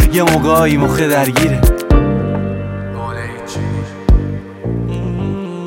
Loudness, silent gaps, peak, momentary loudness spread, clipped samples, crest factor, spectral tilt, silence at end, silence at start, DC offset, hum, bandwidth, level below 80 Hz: -15 LUFS; none; 0 dBFS; 12 LU; under 0.1%; 14 dB; -6 dB/octave; 0 s; 0 s; under 0.1%; none; 17 kHz; -20 dBFS